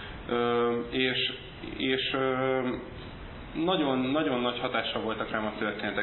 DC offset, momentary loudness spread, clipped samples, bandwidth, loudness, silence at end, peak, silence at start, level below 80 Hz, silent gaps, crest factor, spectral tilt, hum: under 0.1%; 13 LU; under 0.1%; 4.3 kHz; -29 LUFS; 0 s; -12 dBFS; 0 s; -52 dBFS; none; 18 dB; -9 dB/octave; none